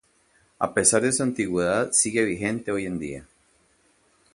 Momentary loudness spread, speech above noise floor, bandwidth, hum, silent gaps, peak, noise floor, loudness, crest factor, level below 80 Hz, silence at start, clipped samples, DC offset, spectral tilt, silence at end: 12 LU; 39 dB; 11.5 kHz; none; none; -4 dBFS; -63 dBFS; -23 LUFS; 22 dB; -56 dBFS; 0.6 s; under 0.1%; under 0.1%; -3.5 dB/octave; 1.1 s